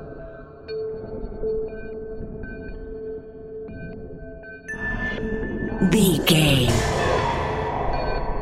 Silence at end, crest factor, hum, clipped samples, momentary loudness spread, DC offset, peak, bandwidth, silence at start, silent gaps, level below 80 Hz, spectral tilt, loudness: 0 s; 20 dB; none; under 0.1%; 20 LU; under 0.1%; -4 dBFS; 16 kHz; 0 s; none; -34 dBFS; -5 dB/octave; -23 LUFS